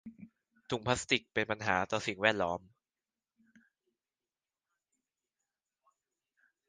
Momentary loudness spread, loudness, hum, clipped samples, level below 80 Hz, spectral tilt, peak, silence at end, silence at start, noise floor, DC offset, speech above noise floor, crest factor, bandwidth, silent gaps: 10 LU; -33 LUFS; none; under 0.1%; -66 dBFS; -3.5 dB/octave; -10 dBFS; 4.1 s; 0.05 s; under -90 dBFS; under 0.1%; over 57 dB; 28 dB; 9.6 kHz; none